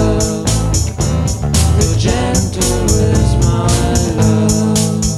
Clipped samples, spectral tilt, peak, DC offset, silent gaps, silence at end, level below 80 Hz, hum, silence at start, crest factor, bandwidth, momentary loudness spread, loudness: under 0.1%; -5 dB/octave; 0 dBFS; under 0.1%; none; 0 s; -20 dBFS; none; 0 s; 12 dB; 14 kHz; 3 LU; -13 LUFS